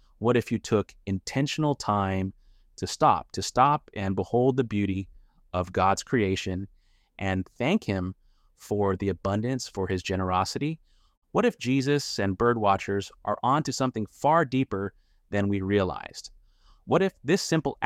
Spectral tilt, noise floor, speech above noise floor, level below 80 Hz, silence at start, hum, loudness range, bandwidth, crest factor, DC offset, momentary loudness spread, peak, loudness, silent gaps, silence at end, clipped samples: -5.5 dB/octave; -58 dBFS; 32 dB; -54 dBFS; 0.2 s; none; 3 LU; 15.5 kHz; 18 dB; under 0.1%; 10 LU; -8 dBFS; -27 LUFS; 11.17-11.22 s; 0 s; under 0.1%